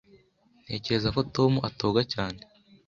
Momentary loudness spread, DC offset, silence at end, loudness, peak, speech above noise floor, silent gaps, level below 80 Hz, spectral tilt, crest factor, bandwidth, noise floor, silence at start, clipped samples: 11 LU; under 0.1%; 0.5 s; -27 LUFS; -8 dBFS; 36 dB; none; -52 dBFS; -6.5 dB/octave; 20 dB; 7.4 kHz; -63 dBFS; 0.7 s; under 0.1%